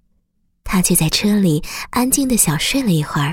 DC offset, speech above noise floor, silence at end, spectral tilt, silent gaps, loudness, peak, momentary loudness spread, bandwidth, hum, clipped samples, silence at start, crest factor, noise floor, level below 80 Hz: under 0.1%; 47 dB; 0 s; -4 dB/octave; none; -16 LUFS; 0 dBFS; 6 LU; 17 kHz; none; under 0.1%; 0.65 s; 18 dB; -63 dBFS; -36 dBFS